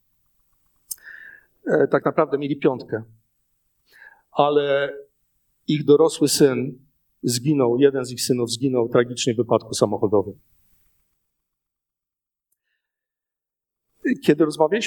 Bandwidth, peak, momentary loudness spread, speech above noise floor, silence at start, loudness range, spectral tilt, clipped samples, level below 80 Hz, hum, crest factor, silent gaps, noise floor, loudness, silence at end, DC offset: 19 kHz; -2 dBFS; 17 LU; 68 dB; 0.9 s; 7 LU; -5 dB/octave; under 0.1%; -66 dBFS; none; 20 dB; none; -87 dBFS; -21 LUFS; 0 s; under 0.1%